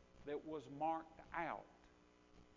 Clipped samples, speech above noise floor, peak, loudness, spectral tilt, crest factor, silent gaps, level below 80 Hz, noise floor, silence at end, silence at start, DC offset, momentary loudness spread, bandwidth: under 0.1%; 23 dB; -30 dBFS; -47 LUFS; -4.5 dB/octave; 20 dB; none; -72 dBFS; -69 dBFS; 0.05 s; 0 s; under 0.1%; 8 LU; 7.2 kHz